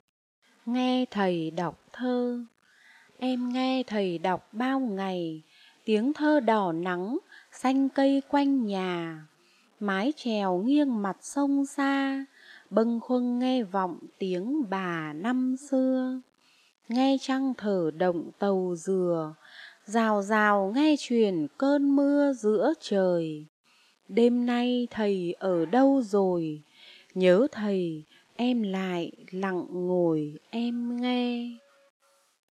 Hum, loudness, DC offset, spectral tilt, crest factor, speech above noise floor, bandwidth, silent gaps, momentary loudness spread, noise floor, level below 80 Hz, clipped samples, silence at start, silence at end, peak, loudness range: none; -27 LUFS; under 0.1%; -6 dB/octave; 20 dB; 32 dB; 10 kHz; 23.49-23.64 s; 12 LU; -59 dBFS; -78 dBFS; under 0.1%; 0.65 s; 1.05 s; -8 dBFS; 5 LU